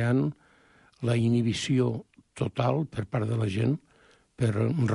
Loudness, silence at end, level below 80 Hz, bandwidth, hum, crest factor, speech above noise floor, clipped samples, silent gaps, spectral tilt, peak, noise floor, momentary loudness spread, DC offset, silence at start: -28 LUFS; 0 s; -56 dBFS; 11 kHz; none; 16 dB; 35 dB; under 0.1%; none; -7 dB/octave; -12 dBFS; -61 dBFS; 8 LU; under 0.1%; 0 s